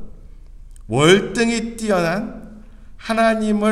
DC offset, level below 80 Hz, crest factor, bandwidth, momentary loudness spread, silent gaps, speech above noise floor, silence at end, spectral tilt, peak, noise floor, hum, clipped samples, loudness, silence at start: under 0.1%; -40 dBFS; 20 dB; 13.5 kHz; 16 LU; none; 22 dB; 0 s; -5 dB/octave; 0 dBFS; -39 dBFS; none; under 0.1%; -18 LUFS; 0 s